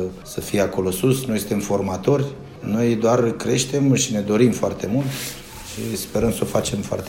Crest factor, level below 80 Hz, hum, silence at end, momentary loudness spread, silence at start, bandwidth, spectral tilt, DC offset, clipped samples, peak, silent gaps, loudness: 18 dB; -46 dBFS; none; 0 s; 11 LU; 0 s; 16.5 kHz; -5.5 dB/octave; under 0.1%; under 0.1%; -2 dBFS; none; -21 LUFS